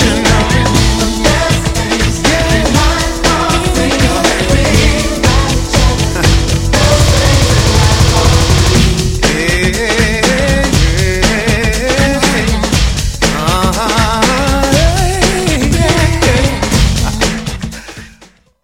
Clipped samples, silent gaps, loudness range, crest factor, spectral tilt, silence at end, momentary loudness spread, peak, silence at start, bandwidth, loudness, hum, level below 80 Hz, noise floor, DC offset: 0.1%; none; 2 LU; 10 dB; -4.5 dB/octave; 0.55 s; 4 LU; 0 dBFS; 0 s; 16.5 kHz; -11 LUFS; none; -16 dBFS; -43 dBFS; under 0.1%